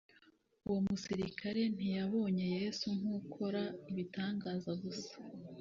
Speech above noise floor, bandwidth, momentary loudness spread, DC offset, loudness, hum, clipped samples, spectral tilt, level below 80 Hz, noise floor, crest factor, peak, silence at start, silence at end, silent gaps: 30 dB; 7.4 kHz; 9 LU; under 0.1%; -39 LUFS; none; under 0.1%; -6 dB/octave; -70 dBFS; -69 dBFS; 14 dB; -26 dBFS; 0.7 s; 0 s; none